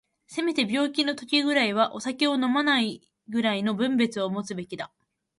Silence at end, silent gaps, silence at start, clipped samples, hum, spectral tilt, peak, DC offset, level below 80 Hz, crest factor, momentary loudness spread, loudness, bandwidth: 0.55 s; none; 0.3 s; under 0.1%; none; -4 dB/octave; -8 dBFS; under 0.1%; -72 dBFS; 18 dB; 13 LU; -25 LUFS; 11.5 kHz